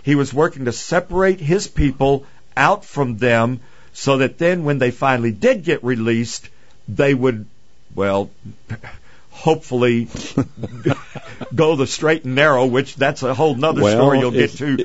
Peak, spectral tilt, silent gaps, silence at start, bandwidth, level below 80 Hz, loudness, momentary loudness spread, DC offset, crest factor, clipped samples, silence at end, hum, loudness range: 0 dBFS; -6 dB/octave; none; 0.05 s; 8 kHz; -40 dBFS; -18 LUFS; 12 LU; 1%; 18 dB; under 0.1%; 0 s; none; 6 LU